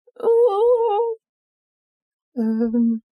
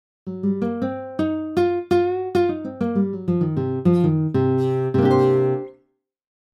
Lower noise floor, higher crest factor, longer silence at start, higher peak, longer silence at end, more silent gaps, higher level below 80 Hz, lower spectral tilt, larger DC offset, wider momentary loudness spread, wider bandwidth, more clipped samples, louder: first, under -90 dBFS vs -67 dBFS; about the same, 12 dB vs 16 dB; about the same, 0.2 s vs 0.25 s; second, -10 dBFS vs -6 dBFS; second, 0.15 s vs 0.8 s; first, 1.29-2.32 s vs none; second, -64 dBFS vs -58 dBFS; about the same, -9 dB/octave vs -9.5 dB/octave; neither; about the same, 11 LU vs 9 LU; second, 5 kHz vs 10 kHz; neither; about the same, -19 LUFS vs -21 LUFS